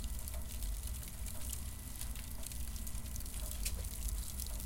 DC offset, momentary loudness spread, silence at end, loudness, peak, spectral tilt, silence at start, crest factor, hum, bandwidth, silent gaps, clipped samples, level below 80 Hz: under 0.1%; 4 LU; 0 s; -43 LUFS; -22 dBFS; -3 dB/octave; 0 s; 20 dB; none; 17 kHz; none; under 0.1%; -44 dBFS